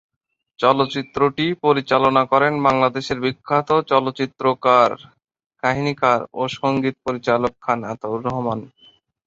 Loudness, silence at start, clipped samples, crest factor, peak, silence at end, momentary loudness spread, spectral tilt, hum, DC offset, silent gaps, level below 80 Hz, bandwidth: -19 LUFS; 0.6 s; under 0.1%; 18 dB; -2 dBFS; 0.6 s; 9 LU; -6 dB/octave; none; under 0.1%; 5.46-5.50 s; -56 dBFS; 7.8 kHz